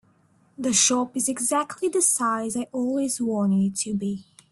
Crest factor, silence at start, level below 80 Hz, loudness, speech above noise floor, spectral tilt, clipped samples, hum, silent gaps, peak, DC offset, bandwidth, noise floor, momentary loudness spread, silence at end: 18 dB; 0.6 s; -64 dBFS; -23 LUFS; 37 dB; -3.5 dB/octave; under 0.1%; none; none; -6 dBFS; under 0.1%; 12.5 kHz; -61 dBFS; 9 LU; 0.3 s